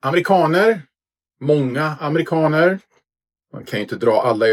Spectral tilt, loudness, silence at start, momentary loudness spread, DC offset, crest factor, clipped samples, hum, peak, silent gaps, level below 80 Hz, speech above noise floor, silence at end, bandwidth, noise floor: -7 dB/octave; -18 LUFS; 0.05 s; 12 LU; under 0.1%; 16 dB; under 0.1%; none; -2 dBFS; none; -68 dBFS; 66 dB; 0 s; 15.5 kHz; -83 dBFS